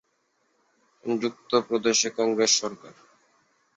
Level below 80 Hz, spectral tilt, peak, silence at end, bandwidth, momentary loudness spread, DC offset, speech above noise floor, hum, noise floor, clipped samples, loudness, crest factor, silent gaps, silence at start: -72 dBFS; -2 dB/octave; -8 dBFS; 0.85 s; 8.4 kHz; 15 LU; under 0.1%; 46 dB; none; -71 dBFS; under 0.1%; -24 LUFS; 20 dB; none; 1.05 s